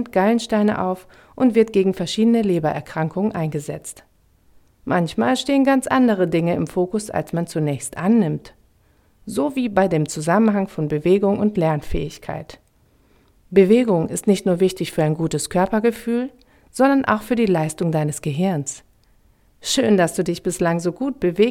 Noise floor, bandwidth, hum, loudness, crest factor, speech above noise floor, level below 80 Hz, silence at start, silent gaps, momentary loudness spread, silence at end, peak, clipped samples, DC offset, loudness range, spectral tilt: -58 dBFS; 16 kHz; none; -20 LUFS; 18 dB; 39 dB; -46 dBFS; 0 s; none; 11 LU; 0 s; -2 dBFS; under 0.1%; under 0.1%; 3 LU; -6 dB/octave